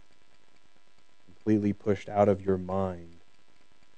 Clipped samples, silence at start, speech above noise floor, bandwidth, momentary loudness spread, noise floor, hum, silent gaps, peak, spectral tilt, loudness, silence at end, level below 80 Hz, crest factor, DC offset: under 0.1%; 1.45 s; 39 dB; 8.6 kHz; 10 LU; -67 dBFS; none; none; -10 dBFS; -9 dB/octave; -28 LUFS; 0.9 s; -70 dBFS; 22 dB; 0.4%